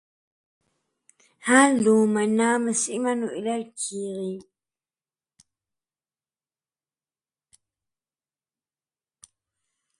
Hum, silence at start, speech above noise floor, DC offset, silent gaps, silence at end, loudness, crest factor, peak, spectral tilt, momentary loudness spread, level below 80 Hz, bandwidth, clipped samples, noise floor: none; 1.45 s; over 68 dB; under 0.1%; none; 5.6 s; -23 LUFS; 22 dB; -4 dBFS; -4 dB/octave; 15 LU; -74 dBFS; 11.5 kHz; under 0.1%; under -90 dBFS